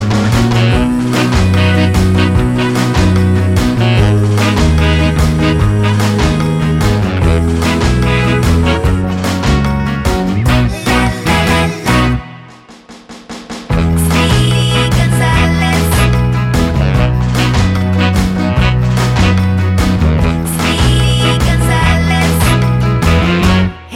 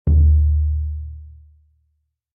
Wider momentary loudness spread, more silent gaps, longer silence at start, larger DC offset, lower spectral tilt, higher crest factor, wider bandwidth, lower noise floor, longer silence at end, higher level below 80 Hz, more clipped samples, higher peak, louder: second, 3 LU vs 20 LU; neither; about the same, 0 s vs 0.05 s; neither; second, -6 dB/octave vs -15.5 dB/octave; about the same, 10 dB vs 12 dB; first, 16 kHz vs 0.8 kHz; second, -36 dBFS vs -69 dBFS; second, 0 s vs 1.05 s; about the same, -20 dBFS vs -22 dBFS; neither; first, 0 dBFS vs -6 dBFS; first, -12 LUFS vs -18 LUFS